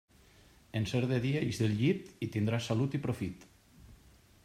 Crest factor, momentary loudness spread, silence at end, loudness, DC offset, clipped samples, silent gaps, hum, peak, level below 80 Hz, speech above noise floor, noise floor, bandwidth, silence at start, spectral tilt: 16 dB; 8 LU; 0.5 s; -33 LUFS; under 0.1%; under 0.1%; none; none; -18 dBFS; -62 dBFS; 29 dB; -61 dBFS; 14.5 kHz; 0.75 s; -6.5 dB/octave